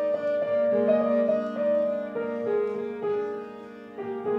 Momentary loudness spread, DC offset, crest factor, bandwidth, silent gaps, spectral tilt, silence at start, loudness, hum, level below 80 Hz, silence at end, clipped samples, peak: 14 LU; under 0.1%; 16 dB; 5.8 kHz; none; -8 dB/octave; 0 s; -26 LUFS; none; -72 dBFS; 0 s; under 0.1%; -10 dBFS